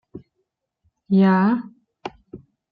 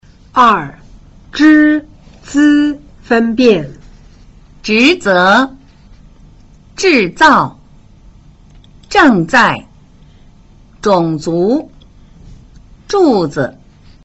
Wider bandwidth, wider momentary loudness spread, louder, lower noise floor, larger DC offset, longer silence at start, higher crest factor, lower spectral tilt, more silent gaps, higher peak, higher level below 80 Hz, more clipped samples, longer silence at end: second, 5 kHz vs 8.2 kHz; first, 21 LU vs 12 LU; second, -18 LUFS vs -11 LUFS; first, -76 dBFS vs -42 dBFS; neither; second, 0.15 s vs 0.35 s; about the same, 16 dB vs 14 dB; first, -10 dB/octave vs -5 dB/octave; neither; second, -6 dBFS vs 0 dBFS; second, -62 dBFS vs -42 dBFS; neither; second, 0.35 s vs 0.55 s